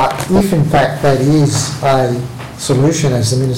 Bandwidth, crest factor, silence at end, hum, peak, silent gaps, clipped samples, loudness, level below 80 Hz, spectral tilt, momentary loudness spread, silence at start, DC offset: 16.5 kHz; 12 dB; 0 s; none; 0 dBFS; none; under 0.1%; -13 LUFS; -38 dBFS; -5.5 dB/octave; 6 LU; 0 s; 2%